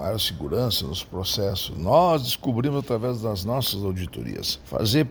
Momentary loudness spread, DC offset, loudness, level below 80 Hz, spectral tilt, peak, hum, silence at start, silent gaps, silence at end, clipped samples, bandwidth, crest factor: 9 LU; under 0.1%; -24 LUFS; -44 dBFS; -5 dB/octave; -6 dBFS; none; 0 s; none; 0 s; under 0.1%; over 20 kHz; 18 dB